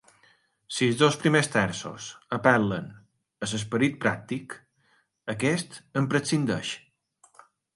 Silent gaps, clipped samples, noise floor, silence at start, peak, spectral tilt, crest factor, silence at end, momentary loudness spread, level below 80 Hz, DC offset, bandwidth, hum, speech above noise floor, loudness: none; under 0.1%; -68 dBFS; 0.7 s; -6 dBFS; -5 dB/octave; 22 dB; 1 s; 16 LU; -62 dBFS; under 0.1%; 11.5 kHz; none; 42 dB; -26 LUFS